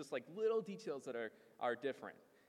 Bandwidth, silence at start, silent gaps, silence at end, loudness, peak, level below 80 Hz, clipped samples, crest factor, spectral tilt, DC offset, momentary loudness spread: 12.5 kHz; 0 s; none; 0.35 s; -43 LUFS; -28 dBFS; under -90 dBFS; under 0.1%; 16 dB; -5 dB/octave; under 0.1%; 11 LU